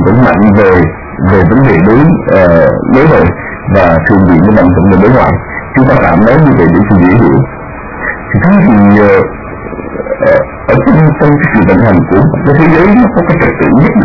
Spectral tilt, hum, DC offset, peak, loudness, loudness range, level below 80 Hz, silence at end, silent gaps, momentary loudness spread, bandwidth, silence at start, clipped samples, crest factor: -10.5 dB/octave; none; under 0.1%; 0 dBFS; -6 LUFS; 2 LU; -26 dBFS; 0 s; none; 10 LU; 6 kHz; 0 s; 3%; 6 dB